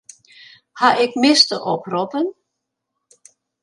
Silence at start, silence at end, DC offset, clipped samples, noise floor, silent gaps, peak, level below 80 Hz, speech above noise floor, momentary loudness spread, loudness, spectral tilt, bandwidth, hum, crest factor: 0.75 s; 1.3 s; under 0.1%; under 0.1%; -78 dBFS; none; 0 dBFS; -74 dBFS; 61 dB; 11 LU; -17 LUFS; -3 dB/octave; 11.5 kHz; none; 20 dB